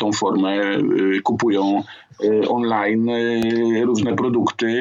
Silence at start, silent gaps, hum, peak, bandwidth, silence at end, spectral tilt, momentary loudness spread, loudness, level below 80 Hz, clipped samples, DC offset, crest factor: 0 s; none; none; -6 dBFS; 7.8 kHz; 0 s; -5.5 dB/octave; 2 LU; -19 LUFS; -62 dBFS; under 0.1%; under 0.1%; 12 dB